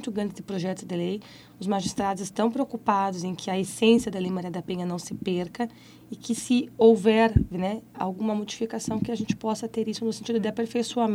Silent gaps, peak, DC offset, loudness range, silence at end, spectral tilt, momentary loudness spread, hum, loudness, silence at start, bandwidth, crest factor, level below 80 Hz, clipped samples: none; -6 dBFS; under 0.1%; 4 LU; 0 s; -5.5 dB/octave; 11 LU; none; -27 LUFS; 0 s; 15.5 kHz; 20 dB; -46 dBFS; under 0.1%